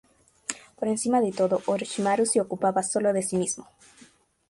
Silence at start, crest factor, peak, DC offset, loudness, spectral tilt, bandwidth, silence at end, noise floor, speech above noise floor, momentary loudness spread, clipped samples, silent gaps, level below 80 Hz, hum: 0.5 s; 18 dB; -8 dBFS; under 0.1%; -26 LUFS; -4.5 dB/octave; 11.5 kHz; 0.85 s; -57 dBFS; 32 dB; 12 LU; under 0.1%; none; -68 dBFS; none